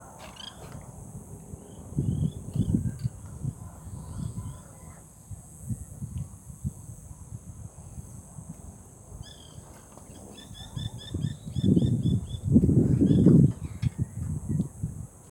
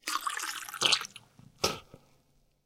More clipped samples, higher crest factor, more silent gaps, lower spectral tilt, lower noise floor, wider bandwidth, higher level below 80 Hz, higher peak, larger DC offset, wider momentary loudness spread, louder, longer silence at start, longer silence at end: neither; second, 22 dB vs 28 dB; neither; first, -8 dB/octave vs -0.5 dB/octave; second, -48 dBFS vs -68 dBFS; about the same, 16.5 kHz vs 17 kHz; first, -46 dBFS vs -66 dBFS; about the same, -6 dBFS vs -8 dBFS; neither; first, 23 LU vs 14 LU; first, -27 LUFS vs -30 LUFS; about the same, 0 s vs 0.05 s; second, 0.25 s vs 0.7 s